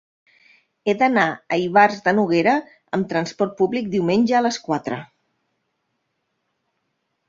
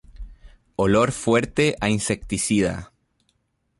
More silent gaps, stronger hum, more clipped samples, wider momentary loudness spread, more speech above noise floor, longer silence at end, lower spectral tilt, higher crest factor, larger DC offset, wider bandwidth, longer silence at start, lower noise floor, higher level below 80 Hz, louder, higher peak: neither; neither; neither; about the same, 9 LU vs 7 LU; first, 55 dB vs 48 dB; first, 2.25 s vs 0.95 s; about the same, -5.5 dB/octave vs -5 dB/octave; about the same, 20 dB vs 18 dB; neither; second, 7.6 kHz vs 11.5 kHz; first, 0.85 s vs 0.15 s; first, -74 dBFS vs -69 dBFS; second, -64 dBFS vs -44 dBFS; about the same, -20 LUFS vs -21 LUFS; first, -2 dBFS vs -6 dBFS